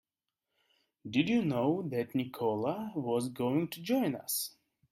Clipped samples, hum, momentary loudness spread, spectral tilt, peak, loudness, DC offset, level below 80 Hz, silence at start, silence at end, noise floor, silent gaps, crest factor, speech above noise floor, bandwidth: under 0.1%; none; 6 LU; -5.5 dB/octave; -16 dBFS; -33 LUFS; under 0.1%; -74 dBFS; 1.05 s; 0.4 s; -89 dBFS; none; 18 dB; 57 dB; 16 kHz